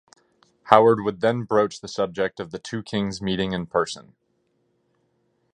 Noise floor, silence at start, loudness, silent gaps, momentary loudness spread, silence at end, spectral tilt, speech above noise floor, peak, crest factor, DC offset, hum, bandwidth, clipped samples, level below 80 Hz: -69 dBFS; 0.65 s; -23 LUFS; none; 14 LU; 1.5 s; -5.5 dB/octave; 47 dB; 0 dBFS; 24 dB; under 0.1%; none; 10 kHz; under 0.1%; -56 dBFS